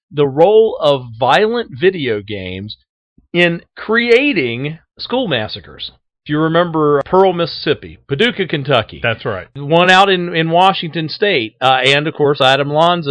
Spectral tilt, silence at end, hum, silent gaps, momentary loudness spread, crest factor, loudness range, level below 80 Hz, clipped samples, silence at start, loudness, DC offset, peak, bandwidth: -5.5 dB/octave; 0 s; none; 2.89-3.16 s; 15 LU; 14 dB; 4 LU; -50 dBFS; 0.1%; 0.1 s; -14 LUFS; under 0.1%; 0 dBFS; 11 kHz